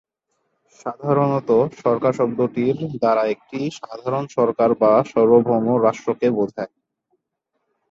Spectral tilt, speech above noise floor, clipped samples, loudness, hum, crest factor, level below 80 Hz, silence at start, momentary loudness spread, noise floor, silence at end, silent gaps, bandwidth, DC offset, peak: -8 dB/octave; 57 dB; under 0.1%; -19 LUFS; none; 18 dB; -62 dBFS; 0.85 s; 13 LU; -76 dBFS; 1.25 s; none; 7.6 kHz; under 0.1%; -2 dBFS